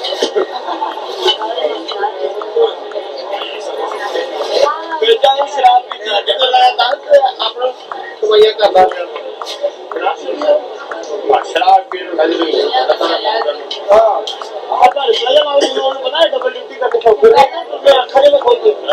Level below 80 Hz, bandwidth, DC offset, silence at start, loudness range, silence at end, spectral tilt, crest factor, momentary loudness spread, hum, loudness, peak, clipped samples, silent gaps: -56 dBFS; 12.5 kHz; under 0.1%; 0 s; 6 LU; 0 s; -2 dB/octave; 12 dB; 12 LU; none; -13 LUFS; 0 dBFS; 0.5%; none